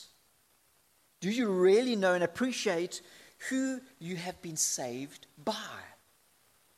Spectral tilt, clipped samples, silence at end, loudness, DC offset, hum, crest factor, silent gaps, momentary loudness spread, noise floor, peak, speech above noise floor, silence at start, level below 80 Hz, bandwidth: -3.5 dB/octave; under 0.1%; 0.9 s; -31 LUFS; under 0.1%; none; 18 dB; none; 17 LU; -69 dBFS; -14 dBFS; 38 dB; 0 s; -78 dBFS; 15 kHz